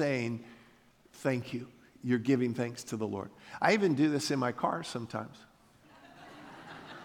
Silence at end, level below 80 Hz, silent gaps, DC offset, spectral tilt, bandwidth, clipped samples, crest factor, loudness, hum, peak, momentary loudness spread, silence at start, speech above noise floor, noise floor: 0 s; -74 dBFS; none; under 0.1%; -5.5 dB/octave; 17.5 kHz; under 0.1%; 22 dB; -32 LUFS; none; -12 dBFS; 22 LU; 0 s; 31 dB; -62 dBFS